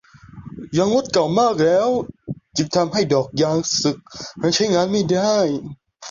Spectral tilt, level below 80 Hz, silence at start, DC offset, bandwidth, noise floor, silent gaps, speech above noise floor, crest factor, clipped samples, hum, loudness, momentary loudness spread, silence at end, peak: -4.5 dB/octave; -54 dBFS; 0.35 s; under 0.1%; 7.6 kHz; -40 dBFS; none; 21 dB; 16 dB; under 0.1%; none; -19 LUFS; 16 LU; 0 s; -4 dBFS